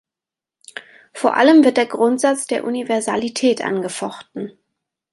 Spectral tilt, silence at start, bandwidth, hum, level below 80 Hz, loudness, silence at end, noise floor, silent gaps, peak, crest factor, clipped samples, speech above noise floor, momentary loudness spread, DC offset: -4 dB/octave; 0.75 s; 11.5 kHz; none; -68 dBFS; -17 LUFS; 0.6 s; -88 dBFS; none; 0 dBFS; 18 dB; under 0.1%; 71 dB; 24 LU; under 0.1%